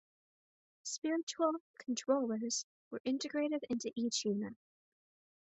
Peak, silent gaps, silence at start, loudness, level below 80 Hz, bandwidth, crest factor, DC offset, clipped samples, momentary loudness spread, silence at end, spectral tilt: -20 dBFS; 1.23-1.27 s, 1.60-1.74 s, 2.64-2.91 s, 3.00-3.05 s; 0.85 s; -37 LUFS; -82 dBFS; 8.2 kHz; 20 dB; under 0.1%; under 0.1%; 9 LU; 0.95 s; -3.5 dB/octave